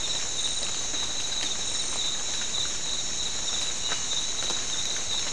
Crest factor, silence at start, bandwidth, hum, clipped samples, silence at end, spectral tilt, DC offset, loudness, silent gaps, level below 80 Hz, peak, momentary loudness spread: 18 dB; 0 s; 12 kHz; none; under 0.1%; 0 s; 0.5 dB/octave; 2%; -27 LUFS; none; -50 dBFS; -14 dBFS; 1 LU